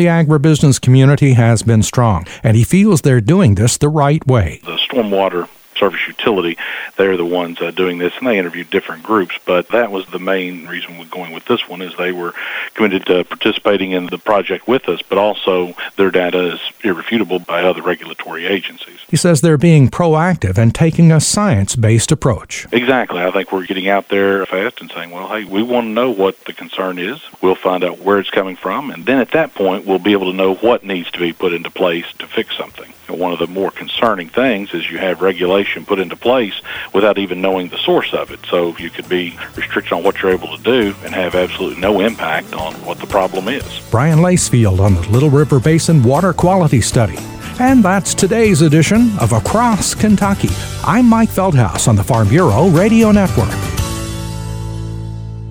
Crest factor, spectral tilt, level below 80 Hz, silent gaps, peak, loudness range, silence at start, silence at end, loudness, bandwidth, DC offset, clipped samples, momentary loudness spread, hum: 14 dB; -5.5 dB/octave; -36 dBFS; none; 0 dBFS; 6 LU; 0 s; 0 s; -14 LUFS; over 20 kHz; under 0.1%; under 0.1%; 11 LU; none